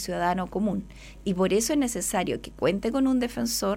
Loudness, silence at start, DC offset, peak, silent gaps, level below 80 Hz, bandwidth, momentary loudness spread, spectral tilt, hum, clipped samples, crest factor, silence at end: -26 LUFS; 0 s; under 0.1%; -10 dBFS; none; -48 dBFS; 16.5 kHz; 8 LU; -4.5 dB/octave; none; under 0.1%; 16 dB; 0 s